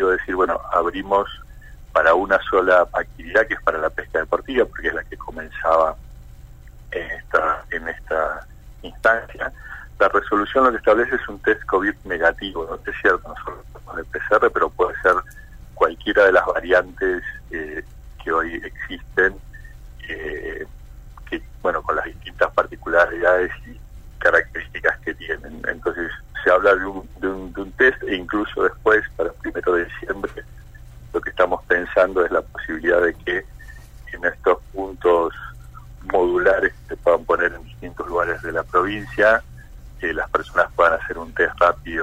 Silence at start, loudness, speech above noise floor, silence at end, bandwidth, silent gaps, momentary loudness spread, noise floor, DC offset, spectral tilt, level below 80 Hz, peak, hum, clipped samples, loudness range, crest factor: 0 s; -20 LUFS; 20 dB; 0 s; 16 kHz; none; 15 LU; -41 dBFS; under 0.1%; -5.5 dB/octave; -40 dBFS; -2 dBFS; none; under 0.1%; 5 LU; 18 dB